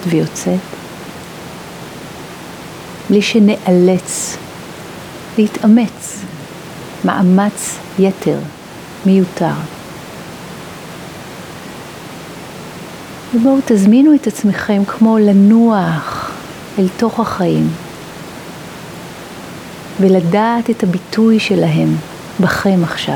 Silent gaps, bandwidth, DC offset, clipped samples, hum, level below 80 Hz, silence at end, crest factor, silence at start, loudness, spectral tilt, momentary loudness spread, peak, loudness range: none; 19.5 kHz; under 0.1%; under 0.1%; none; -50 dBFS; 0 s; 14 dB; 0 s; -13 LUFS; -6 dB/octave; 19 LU; 0 dBFS; 9 LU